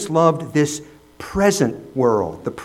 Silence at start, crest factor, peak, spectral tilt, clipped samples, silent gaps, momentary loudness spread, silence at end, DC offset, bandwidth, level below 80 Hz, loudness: 0 s; 18 dB; 0 dBFS; -5.5 dB/octave; under 0.1%; none; 11 LU; 0 s; under 0.1%; 16 kHz; -46 dBFS; -19 LUFS